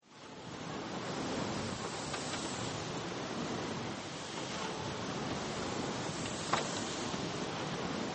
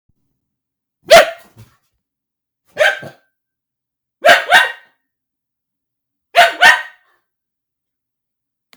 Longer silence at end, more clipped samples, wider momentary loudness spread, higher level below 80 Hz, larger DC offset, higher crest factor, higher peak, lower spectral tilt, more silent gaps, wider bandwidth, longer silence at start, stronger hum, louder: second, 0 s vs 1.9 s; second, under 0.1% vs 0.2%; second, 4 LU vs 11 LU; second, -64 dBFS vs -52 dBFS; neither; first, 22 dB vs 16 dB; second, -16 dBFS vs 0 dBFS; first, -4 dB/octave vs -0.5 dB/octave; neither; second, 8.8 kHz vs over 20 kHz; second, 0.05 s vs 1.1 s; neither; second, -38 LUFS vs -10 LUFS